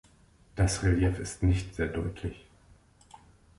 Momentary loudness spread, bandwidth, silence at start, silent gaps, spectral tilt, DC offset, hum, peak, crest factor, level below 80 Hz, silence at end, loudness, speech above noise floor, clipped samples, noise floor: 14 LU; 11.5 kHz; 0.55 s; none; -6 dB/octave; under 0.1%; none; -14 dBFS; 16 dB; -40 dBFS; 1.2 s; -30 LUFS; 32 dB; under 0.1%; -60 dBFS